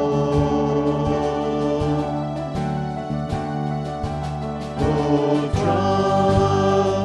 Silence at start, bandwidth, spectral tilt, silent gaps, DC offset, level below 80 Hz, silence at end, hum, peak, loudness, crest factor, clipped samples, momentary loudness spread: 0 s; 10.5 kHz; -7.5 dB/octave; none; under 0.1%; -38 dBFS; 0 s; none; -4 dBFS; -21 LUFS; 16 dB; under 0.1%; 9 LU